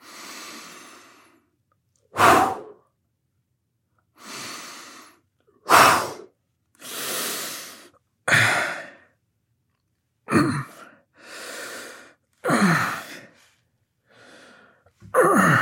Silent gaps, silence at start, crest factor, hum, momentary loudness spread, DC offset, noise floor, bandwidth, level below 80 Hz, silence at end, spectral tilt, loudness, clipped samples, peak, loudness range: none; 0.15 s; 24 dB; none; 25 LU; under 0.1%; -74 dBFS; 17 kHz; -66 dBFS; 0 s; -4 dB/octave; -20 LUFS; under 0.1%; -2 dBFS; 7 LU